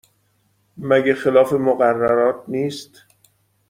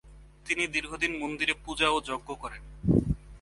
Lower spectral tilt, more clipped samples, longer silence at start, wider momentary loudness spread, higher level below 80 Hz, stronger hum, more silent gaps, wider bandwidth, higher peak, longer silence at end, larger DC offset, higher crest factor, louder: first, -6.5 dB/octave vs -4.5 dB/octave; neither; first, 0.75 s vs 0.05 s; second, 10 LU vs 13 LU; second, -60 dBFS vs -44 dBFS; neither; neither; first, 15.5 kHz vs 11.5 kHz; first, -2 dBFS vs -10 dBFS; first, 0.85 s vs 0.05 s; neither; about the same, 18 dB vs 20 dB; first, -18 LUFS vs -29 LUFS